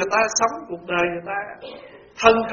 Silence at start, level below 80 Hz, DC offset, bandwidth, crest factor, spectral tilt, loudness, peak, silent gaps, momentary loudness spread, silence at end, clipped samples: 0 s; -54 dBFS; under 0.1%; 7.2 kHz; 22 dB; -2 dB/octave; -21 LUFS; 0 dBFS; none; 21 LU; 0 s; under 0.1%